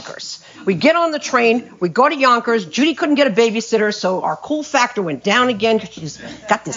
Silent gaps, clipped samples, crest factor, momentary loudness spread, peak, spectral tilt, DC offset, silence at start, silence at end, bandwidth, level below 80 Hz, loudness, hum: none; under 0.1%; 16 dB; 14 LU; -2 dBFS; -4 dB/octave; under 0.1%; 0 s; 0 s; 7.6 kHz; -62 dBFS; -16 LUFS; none